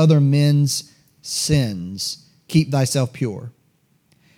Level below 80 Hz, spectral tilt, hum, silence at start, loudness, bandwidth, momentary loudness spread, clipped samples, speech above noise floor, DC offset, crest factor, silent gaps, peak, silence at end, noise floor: -50 dBFS; -5.5 dB/octave; none; 0 s; -20 LUFS; 15.5 kHz; 17 LU; under 0.1%; 43 dB; under 0.1%; 16 dB; none; -4 dBFS; 0.85 s; -62 dBFS